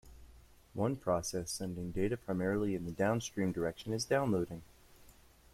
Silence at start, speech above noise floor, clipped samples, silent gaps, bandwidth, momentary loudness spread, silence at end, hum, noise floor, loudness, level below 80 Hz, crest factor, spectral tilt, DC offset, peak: 0.05 s; 26 dB; under 0.1%; none; 16 kHz; 7 LU; 0.45 s; none; -61 dBFS; -36 LUFS; -58 dBFS; 18 dB; -5.5 dB/octave; under 0.1%; -18 dBFS